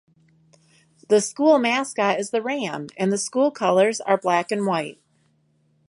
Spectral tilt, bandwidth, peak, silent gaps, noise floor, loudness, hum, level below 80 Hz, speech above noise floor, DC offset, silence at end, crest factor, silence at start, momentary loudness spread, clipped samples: -4 dB/octave; 11.5 kHz; -4 dBFS; none; -64 dBFS; -21 LUFS; none; -74 dBFS; 43 dB; under 0.1%; 0.95 s; 18 dB; 1.1 s; 8 LU; under 0.1%